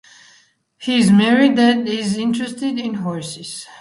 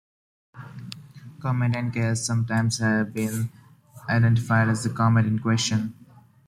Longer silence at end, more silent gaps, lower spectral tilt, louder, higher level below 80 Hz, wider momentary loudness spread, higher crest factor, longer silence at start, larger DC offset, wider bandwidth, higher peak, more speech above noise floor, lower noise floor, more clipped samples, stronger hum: second, 0.05 s vs 0.55 s; neither; about the same, -5 dB/octave vs -5.5 dB/octave; first, -17 LUFS vs -24 LUFS; about the same, -60 dBFS vs -58 dBFS; about the same, 16 LU vs 18 LU; about the same, 16 dB vs 16 dB; first, 0.8 s vs 0.55 s; neither; second, 11.5 kHz vs 14 kHz; first, -2 dBFS vs -10 dBFS; first, 38 dB vs 21 dB; first, -55 dBFS vs -44 dBFS; neither; neither